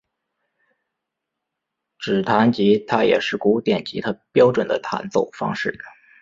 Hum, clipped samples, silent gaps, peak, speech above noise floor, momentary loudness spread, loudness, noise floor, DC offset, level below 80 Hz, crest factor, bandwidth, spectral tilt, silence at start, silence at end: none; under 0.1%; none; -2 dBFS; 62 dB; 10 LU; -20 LUFS; -82 dBFS; under 0.1%; -60 dBFS; 20 dB; 7.6 kHz; -6.5 dB/octave; 2 s; 0.3 s